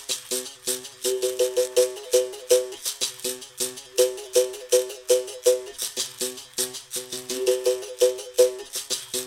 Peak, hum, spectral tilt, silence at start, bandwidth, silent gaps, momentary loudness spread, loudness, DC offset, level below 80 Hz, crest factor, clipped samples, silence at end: -4 dBFS; none; -0.5 dB/octave; 0 s; 17 kHz; none; 8 LU; -25 LUFS; under 0.1%; -66 dBFS; 20 dB; under 0.1%; 0 s